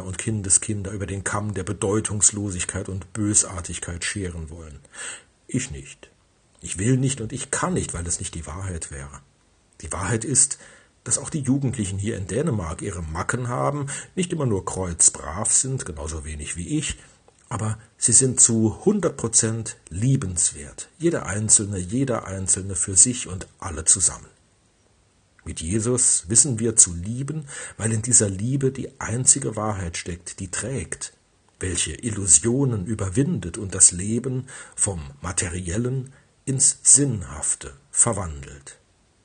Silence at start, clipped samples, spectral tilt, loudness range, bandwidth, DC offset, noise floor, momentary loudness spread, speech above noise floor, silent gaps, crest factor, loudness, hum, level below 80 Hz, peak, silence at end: 0 s; under 0.1%; -3.5 dB/octave; 7 LU; 11.5 kHz; under 0.1%; -61 dBFS; 17 LU; 37 dB; none; 24 dB; -21 LUFS; none; -48 dBFS; 0 dBFS; 0.5 s